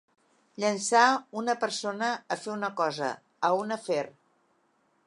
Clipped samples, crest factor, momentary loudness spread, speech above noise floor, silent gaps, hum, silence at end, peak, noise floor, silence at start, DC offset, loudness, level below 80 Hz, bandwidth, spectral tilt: under 0.1%; 22 dB; 11 LU; 42 dB; none; none; 0.95 s; -6 dBFS; -70 dBFS; 0.6 s; under 0.1%; -28 LUFS; -84 dBFS; 11.5 kHz; -3 dB/octave